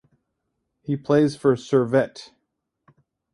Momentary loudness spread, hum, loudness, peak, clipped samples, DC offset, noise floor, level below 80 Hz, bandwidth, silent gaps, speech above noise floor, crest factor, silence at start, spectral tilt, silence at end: 15 LU; none; -21 LUFS; -6 dBFS; under 0.1%; under 0.1%; -77 dBFS; -64 dBFS; 11.5 kHz; none; 57 dB; 18 dB; 0.9 s; -7 dB/octave; 1.1 s